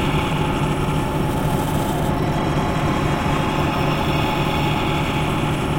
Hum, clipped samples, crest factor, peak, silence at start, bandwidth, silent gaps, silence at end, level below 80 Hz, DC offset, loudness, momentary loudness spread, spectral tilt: none; under 0.1%; 14 dB; -6 dBFS; 0 s; 16.5 kHz; none; 0 s; -32 dBFS; under 0.1%; -20 LUFS; 1 LU; -6 dB/octave